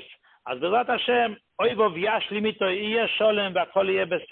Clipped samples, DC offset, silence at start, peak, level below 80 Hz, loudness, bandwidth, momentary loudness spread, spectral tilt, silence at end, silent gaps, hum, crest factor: under 0.1%; under 0.1%; 0 s; -10 dBFS; -66 dBFS; -24 LUFS; 4.4 kHz; 5 LU; -9 dB/octave; 0.05 s; none; none; 16 dB